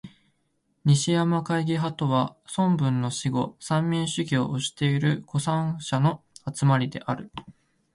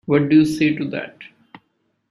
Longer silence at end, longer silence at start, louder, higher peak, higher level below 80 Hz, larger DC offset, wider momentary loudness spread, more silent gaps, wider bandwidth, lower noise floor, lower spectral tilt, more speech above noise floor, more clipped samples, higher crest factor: second, 0.45 s vs 0.85 s; about the same, 0.05 s vs 0.1 s; second, -25 LUFS vs -18 LUFS; second, -8 dBFS vs -4 dBFS; about the same, -60 dBFS vs -58 dBFS; neither; second, 7 LU vs 15 LU; neither; about the same, 11.5 kHz vs 12 kHz; first, -72 dBFS vs -68 dBFS; about the same, -6 dB/octave vs -7 dB/octave; second, 47 dB vs 51 dB; neither; about the same, 16 dB vs 16 dB